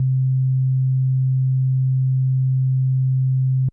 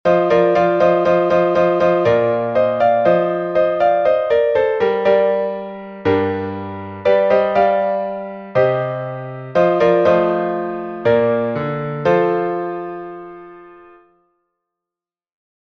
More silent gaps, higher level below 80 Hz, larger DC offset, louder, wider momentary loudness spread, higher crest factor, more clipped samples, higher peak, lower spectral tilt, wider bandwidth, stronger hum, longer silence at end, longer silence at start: neither; second, -62 dBFS vs -54 dBFS; neither; second, -19 LUFS vs -16 LUFS; second, 0 LU vs 12 LU; second, 4 dB vs 14 dB; neither; second, -14 dBFS vs -2 dBFS; first, -15 dB/octave vs -8 dB/octave; second, 0.3 kHz vs 6.2 kHz; neither; second, 0 s vs 1.9 s; about the same, 0 s vs 0.05 s